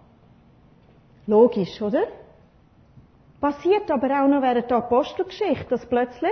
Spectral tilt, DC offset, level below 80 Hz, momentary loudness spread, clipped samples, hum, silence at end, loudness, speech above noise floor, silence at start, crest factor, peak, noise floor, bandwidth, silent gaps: -7.5 dB/octave; under 0.1%; -56 dBFS; 9 LU; under 0.1%; none; 0 s; -22 LUFS; 34 dB; 1.25 s; 18 dB; -4 dBFS; -55 dBFS; 6.4 kHz; none